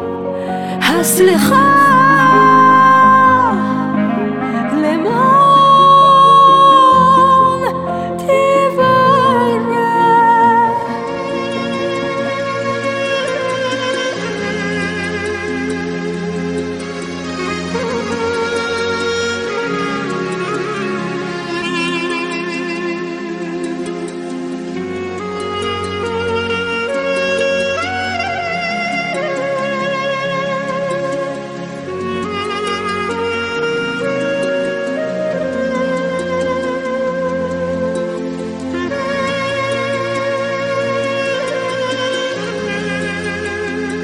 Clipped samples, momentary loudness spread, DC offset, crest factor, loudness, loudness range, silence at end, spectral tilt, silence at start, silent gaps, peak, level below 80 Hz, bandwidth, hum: under 0.1%; 14 LU; under 0.1%; 14 dB; -15 LUFS; 11 LU; 0 s; -4.5 dB/octave; 0 s; none; 0 dBFS; -50 dBFS; 16.5 kHz; none